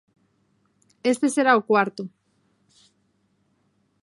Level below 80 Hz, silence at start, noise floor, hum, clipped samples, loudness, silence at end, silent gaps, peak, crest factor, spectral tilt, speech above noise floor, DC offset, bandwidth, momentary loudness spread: -78 dBFS; 1.05 s; -68 dBFS; none; under 0.1%; -21 LUFS; 1.95 s; none; -4 dBFS; 22 dB; -4.5 dB/octave; 47 dB; under 0.1%; 11.5 kHz; 16 LU